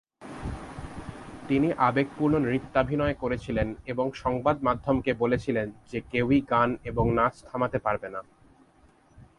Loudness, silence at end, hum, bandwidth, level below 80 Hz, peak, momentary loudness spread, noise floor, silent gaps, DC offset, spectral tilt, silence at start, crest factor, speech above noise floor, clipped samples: -27 LUFS; 0.15 s; none; 11.5 kHz; -46 dBFS; -8 dBFS; 15 LU; -59 dBFS; none; under 0.1%; -8 dB/octave; 0.2 s; 18 dB; 33 dB; under 0.1%